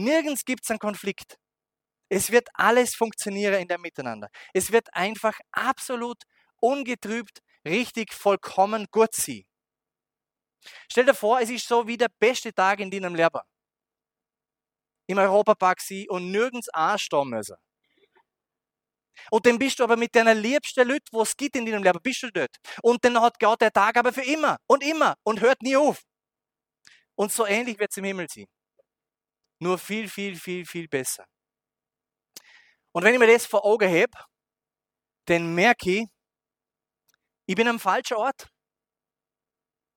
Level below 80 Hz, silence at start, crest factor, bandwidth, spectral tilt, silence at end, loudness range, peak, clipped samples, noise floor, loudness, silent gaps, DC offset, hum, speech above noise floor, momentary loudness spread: -68 dBFS; 0 s; 24 dB; 19.5 kHz; -3.5 dB/octave; 1.5 s; 7 LU; -2 dBFS; under 0.1%; under -90 dBFS; -23 LUFS; none; under 0.1%; none; over 67 dB; 13 LU